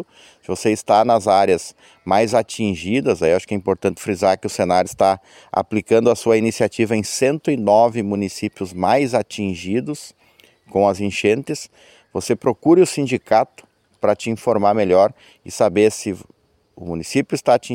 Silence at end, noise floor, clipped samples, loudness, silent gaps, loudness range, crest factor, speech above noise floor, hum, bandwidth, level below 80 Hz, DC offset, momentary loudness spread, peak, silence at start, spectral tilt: 0 s; -53 dBFS; under 0.1%; -18 LUFS; none; 3 LU; 16 dB; 35 dB; none; 16.5 kHz; -56 dBFS; under 0.1%; 13 LU; -2 dBFS; 0 s; -5.5 dB/octave